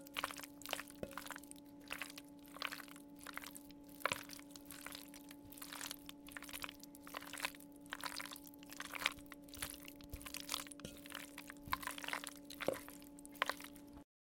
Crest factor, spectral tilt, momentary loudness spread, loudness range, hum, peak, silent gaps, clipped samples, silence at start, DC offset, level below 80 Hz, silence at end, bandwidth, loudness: 36 dB; -2 dB/octave; 13 LU; 3 LU; none; -14 dBFS; none; under 0.1%; 0 s; under 0.1%; -68 dBFS; 0.3 s; 17 kHz; -47 LUFS